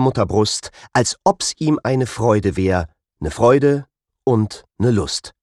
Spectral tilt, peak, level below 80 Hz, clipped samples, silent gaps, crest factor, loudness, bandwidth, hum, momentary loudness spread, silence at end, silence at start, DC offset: -5.5 dB/octave; -2 dBFS; -42 dBFS; under 0.1%; none; 16 dB; -18 LUFS; 12.5 kHz; none; 10 LU; 0.15 s; 0 s; under 0.1%